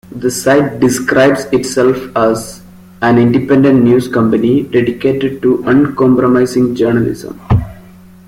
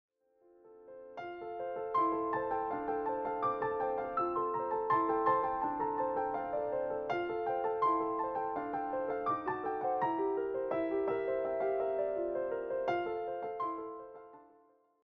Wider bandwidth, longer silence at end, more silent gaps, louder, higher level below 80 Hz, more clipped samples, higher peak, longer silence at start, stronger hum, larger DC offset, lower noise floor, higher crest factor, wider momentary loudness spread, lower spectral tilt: first, 16 kHz vs 6.2 kHz; second, 0.45 s vs 0.6 s; neither; first, -12 LUFS vs -35 LUFS; first, -38 dBFS vs -68 dBFS; neither; first, 0 dBFS vs -16 dBFS; second, 0.1 s vs 0.65 s; neither; neither; second, -37 dBFS vs -67 dBFS; second, 12 dB vs 18 dB; second, 6 LU vs 9 LU; first, -6.5 dB/octave vs -4.5 dB/octave